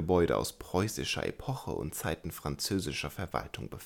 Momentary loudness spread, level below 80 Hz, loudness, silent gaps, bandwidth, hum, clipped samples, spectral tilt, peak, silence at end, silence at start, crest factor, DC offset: 8 LU; -50 dBFS; -34 LUFS; none; 19 kHz; none; under 0.1%; -4.5 dB/octave; -14 dBFS; 0 s; 0 s; 20 dB; under 0.1%